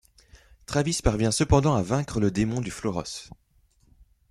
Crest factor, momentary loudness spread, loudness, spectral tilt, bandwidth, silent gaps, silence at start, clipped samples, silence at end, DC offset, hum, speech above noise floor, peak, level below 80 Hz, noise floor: 22 dB; 10 LU; -25 LUFS; -5.5 dB/octave; 13 kHz; none; 0.7 s; under 0.1%; 1.05 s; under 0.1%; none; 37 dB; -6 dBFS; -40 dBFS; -61 dBFS